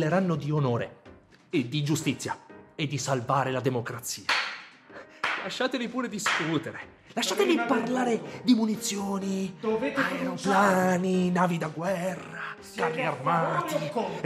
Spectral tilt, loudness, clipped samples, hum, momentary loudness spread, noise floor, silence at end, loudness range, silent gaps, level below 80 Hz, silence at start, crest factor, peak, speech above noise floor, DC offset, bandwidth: -5 dB/octave; -28 LUFS; under 0.1%; none; 12 LU; -53 dBFS; 0 s; 4 LU; none; -70 dBFS; 0 s; 18 dB; -10 dBFS; 26 dB; under 0.1%; 15 kHz